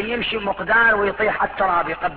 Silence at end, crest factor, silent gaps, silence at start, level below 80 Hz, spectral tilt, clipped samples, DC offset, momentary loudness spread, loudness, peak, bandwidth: 0 s; 14 dB; none; 0 s; -46 dBFS; -7.5 dB/octave; under 0.1%; under 0.1%; 7 LU; -19 LUFS; -4 dBFS; 4.9 kHz